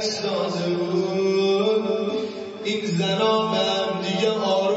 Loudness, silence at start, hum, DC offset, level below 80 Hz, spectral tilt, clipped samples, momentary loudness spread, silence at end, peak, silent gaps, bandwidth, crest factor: -23 LUFS; 0 s; none; under 0.1%; -70 dBFS; -5 dB/octave; under 0.1%; 6 LU; 0 s; -8 dBFS; none; 8 kHz; 14 dB